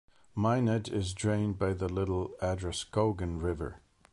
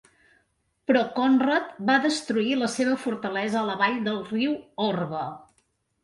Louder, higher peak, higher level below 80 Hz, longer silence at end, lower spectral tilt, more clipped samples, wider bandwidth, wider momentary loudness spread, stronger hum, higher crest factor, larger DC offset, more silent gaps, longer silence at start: second, -32 LUFS vs -25 LUFS; second, -14 dBFS vs -8 dBFS; first, -46 dBFS vs -68 dBFS; second, 0.35 s vs 0.6 s; first, -6.5 dB/octave vs -4.5 dB/octave; neither; about the same, 11.5 kHz vs 11.5 kHz; about the same, 6 LU vs 7 LU; neither; about the same, 16 dB vs 18 dB; neither; neither; second, 0.35 s vs 0.9 s